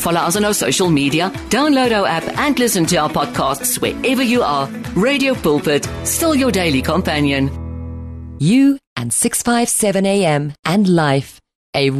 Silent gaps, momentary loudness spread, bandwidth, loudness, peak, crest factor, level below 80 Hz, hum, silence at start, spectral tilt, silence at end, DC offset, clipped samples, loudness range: 8.87-8.96 s, 10.59-10.63 s, 11.55-11.73 s; 7 LU; 13.5 kHz; -16 LUFS; -4 dBFS; 12 dB; -38 dBFS; none; 0 s; -4 dB/octave; 0 s; under 0.1%; under 0.1%; 1 LU